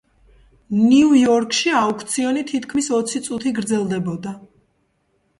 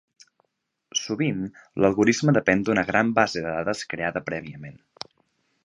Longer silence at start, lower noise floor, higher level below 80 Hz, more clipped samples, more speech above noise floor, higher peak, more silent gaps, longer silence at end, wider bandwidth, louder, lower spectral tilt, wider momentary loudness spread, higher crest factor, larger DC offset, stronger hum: second, 0.7 s vs 0.95 s; second, -66 dBFS vs -77 dBFS; about the same, -58 dBFS vs -56 dBFS; neither; second, 48 dB vs 54 dB; about the same, -4 dBFS vs -2 dBFS; neither; about the same, 0.95 s vs 0.95 s; about the same, 11.5 kHz vs 11 kHz; first, -18 LUFS vs -24 LUFS; about the same, -4.5 dB/octave vs -5 dB/octave; second, 11 LU vs 21 LU; second, 16 dB vs 22 dB; neither; neither